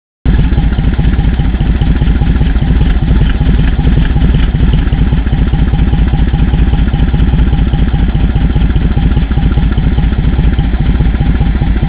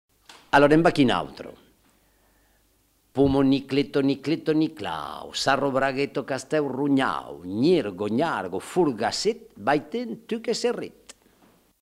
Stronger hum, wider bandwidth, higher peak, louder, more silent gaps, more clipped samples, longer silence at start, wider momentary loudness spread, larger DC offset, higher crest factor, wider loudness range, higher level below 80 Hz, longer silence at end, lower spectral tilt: neither; second, 4 kHz vs 13.5 kHz; first, 0 dBFS vs -4 dBFS; first, -12 LUFS vs -24 LUFS; neither; first, 2% vs under 0.1%; about the same, 0.25 s vs 0.3 s; second, 1 LU vs 12 LU; first, 0.4% vs under 0.1%; second, 8 dB vs 22 dB; about the same, 1 LU vs 3 LU; first, -10 dBFS vs -52 dBFS; second, 0 s vs 0.95 s; first, -11.5 dB/octave vs -5.5 dB/octave